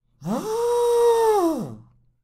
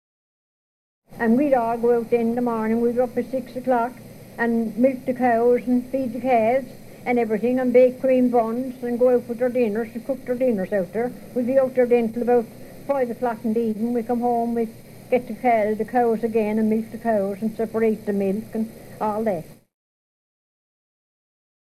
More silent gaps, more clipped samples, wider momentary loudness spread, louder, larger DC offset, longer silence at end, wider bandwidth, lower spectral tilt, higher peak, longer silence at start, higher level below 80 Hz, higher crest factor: neither; neither; first, 12 LU vs 9 LU; about the same, -21 LUFS vs -22 LUFS; neither; second, 0.45 s vs 2.15 s; first, 15 kHz vs 13.5 kHz; second, -5.5 dB/octave vs -7.5 dB/octave; second, -10 dBFS vs -6 dBFS; second, 0.2 s vs 1.1 s; about the same, -58 dBFS vs -56 dBFS; about the same, 12 dB vs 16 dB